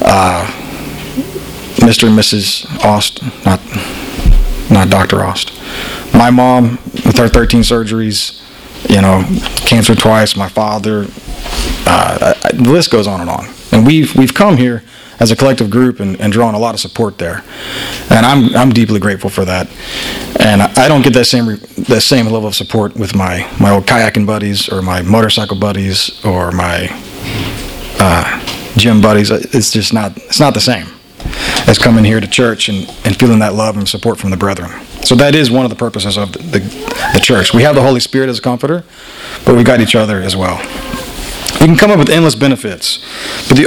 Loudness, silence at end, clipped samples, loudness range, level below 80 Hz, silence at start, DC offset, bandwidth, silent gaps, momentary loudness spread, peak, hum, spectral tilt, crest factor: -10 LUFS; 0 s; 0.9%; 3 LU; -26 dBFS; 0 s; under 0.1%; over 20 kHz; none; 13 LU; 0 dBFS; none; -5 dB/octave; 10 dB